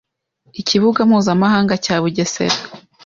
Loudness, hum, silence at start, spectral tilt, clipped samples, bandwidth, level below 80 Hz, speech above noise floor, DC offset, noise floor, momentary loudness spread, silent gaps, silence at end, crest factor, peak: -16 LUFS; none; 0.55 s; -5 dB/octave; under 0.1%; 7.6 kHz; -54 dBFS; 44 dB; under 0.1%; -59 dBFS; 10 LU; none; 0.25 s; 14 dB; -2 dBFS